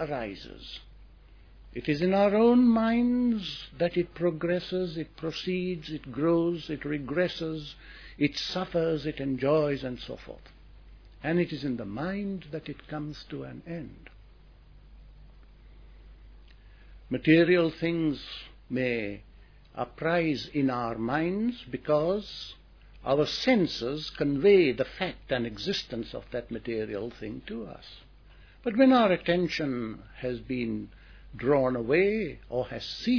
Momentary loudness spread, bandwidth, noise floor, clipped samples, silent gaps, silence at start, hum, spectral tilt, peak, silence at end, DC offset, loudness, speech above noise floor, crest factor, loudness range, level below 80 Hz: 18 LU; 5.4 kHz; -53 dBFS; under 0.1%; none; 0 s; none; -7 dB/octave; -8 dBFS; 0 s; under 0.1%; -28 LUFS; 25 dB; 22 dB; 9 LU; -52 dBFS